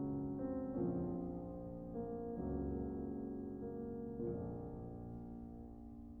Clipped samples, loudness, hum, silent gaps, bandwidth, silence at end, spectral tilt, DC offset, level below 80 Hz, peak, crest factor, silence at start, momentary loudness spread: under 0.1%; -45 LUFS; none; none; 2 kHz; 0 s; -12.5 dB/octave; under 0.1%; -56 dBFS; -30 dBFS; 14 dB; 0 s; 11 LU